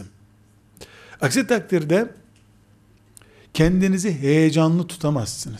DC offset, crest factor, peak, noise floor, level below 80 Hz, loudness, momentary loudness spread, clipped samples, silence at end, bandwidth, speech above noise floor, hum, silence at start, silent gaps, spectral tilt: under 0.1%; 16 dB; -6 dBFS; -55 dBFS; -44 dBFS; -20 LUFS; 8 LU; under 0.1%; 0 s; 15.5 kHz; 35 dB; none; 0 s; none; -6 dB/octave